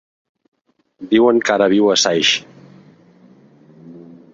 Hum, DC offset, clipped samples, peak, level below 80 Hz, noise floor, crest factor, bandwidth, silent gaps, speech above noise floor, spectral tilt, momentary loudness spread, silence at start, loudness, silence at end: none; under 0.1%; under 0.1%; 0 dBFS; -60 dBFS; -48 dBFS; 18 dB; 7.8 kHz; none; 34 dB; -3 dB/octave; 6 LU; 1 s; -14 LUFS; 0.3 s